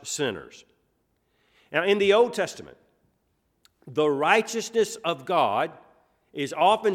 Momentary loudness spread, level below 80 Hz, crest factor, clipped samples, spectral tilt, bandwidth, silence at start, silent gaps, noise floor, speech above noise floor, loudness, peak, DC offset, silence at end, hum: 12 LU; -70 dBFS; 22 dB; under 0.1%; -3.5 dB/octave; 15.5 kHz; 0.05 s; none; -72 dBFS; 48 dB; -24 LUFS; -4 dBFS; under 0.1%; 0 s; none